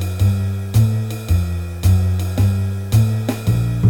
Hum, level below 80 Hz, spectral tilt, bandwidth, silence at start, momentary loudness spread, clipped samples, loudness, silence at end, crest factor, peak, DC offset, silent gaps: none; -30 dBFS; -7 dB/octave; 17.5 kHz; 0 s; 5 LU; under 0.1%; -18 LUFS; 0 s; 14 dB; -2 dBFS; under 0.1%; none